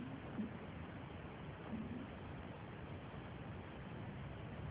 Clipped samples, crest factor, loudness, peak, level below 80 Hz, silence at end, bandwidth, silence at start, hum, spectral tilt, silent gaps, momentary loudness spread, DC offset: under 0.1%; 16 dB; -50 LUFS; -32 dBFS; -60 dBFS; 0 s; 4 kHz; 0 s; none; -6.5 dB/octave; none; 4 LU; under 0.1%